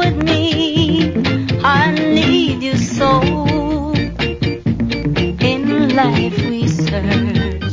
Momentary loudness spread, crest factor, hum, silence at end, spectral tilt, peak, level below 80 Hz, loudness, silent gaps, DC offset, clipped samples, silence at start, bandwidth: 5 LU; 14 dB; none; 0 s; -6 dB/octave; -2 dBFS; -30 dBFS; -15 LUFS; none; under 0.1%; under 0.1%; 0 s; 7.6 kHz